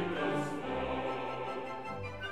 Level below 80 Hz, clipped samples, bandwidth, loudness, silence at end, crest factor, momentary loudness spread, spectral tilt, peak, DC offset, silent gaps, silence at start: -58 dBFS; under 0.1%; 13.5 kHz; -37 LUFS; 0 s; 14 dB; 7 LU; -6 dB/octave; -22 dBFS; 0.3%; none; 0 s